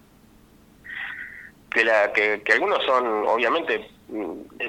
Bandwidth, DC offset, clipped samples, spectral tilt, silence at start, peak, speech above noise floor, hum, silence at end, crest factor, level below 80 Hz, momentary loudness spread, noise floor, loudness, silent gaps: 16.5 kHz; under 0.1%; under 0.1%; -3.5 dB/octave; 0.85 s; -4 dBFS; 31 dB; none; 0 s; 20 dB; -60 dBFS; 17 LU; -53 dBFS; -22 LUFS; none